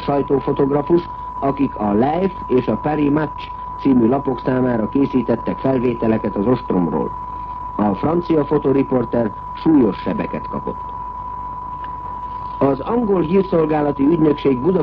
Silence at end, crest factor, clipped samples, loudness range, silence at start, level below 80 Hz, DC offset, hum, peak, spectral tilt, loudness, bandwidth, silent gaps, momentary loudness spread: 0 s; 12 dB; under 0.1%; 3 LU; 0 s; -40 dBFS; under 0.1%; none; -6 dBFS; -10.5 dB/octave; -19 LUFS; 5.4 kHz; none; 12 LU